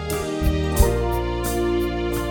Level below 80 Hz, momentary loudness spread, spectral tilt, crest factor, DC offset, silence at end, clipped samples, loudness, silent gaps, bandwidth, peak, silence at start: -26 dBFS; 4 LU; -5.5 dB/octave; 18 dB; under 0.1%; 0 s; under 0.1%; -22 LUFS; none; over 20 kHz; -4 dBFS; 0 s